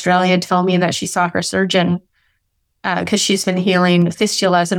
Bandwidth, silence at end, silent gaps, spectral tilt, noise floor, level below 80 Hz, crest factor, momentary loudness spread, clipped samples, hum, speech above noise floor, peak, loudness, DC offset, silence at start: 16 kHz; 0 s; none; -4.5 dB/octave; -68 dBFS; -58 dBFS; 14 dB; 6 LU; under 0.1%; none; 52 dB; -2 dBFS; -16 LUFS; under 0.1%; 0 s